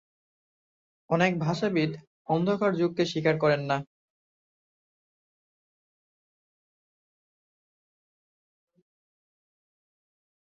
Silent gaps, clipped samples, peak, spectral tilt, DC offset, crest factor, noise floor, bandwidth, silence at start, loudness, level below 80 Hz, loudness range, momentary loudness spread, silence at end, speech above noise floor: 2.07-2.25 s; under 0.1%; -10 dBFS; -6.5 dB/octave; under 0.1%; 22 dB; under -90 dBFS; 7.8 kHz; 1.1 s; -27 LUFS; -70 dBFS; 7 LU; 6 LU; 6.65 s; over 64 dB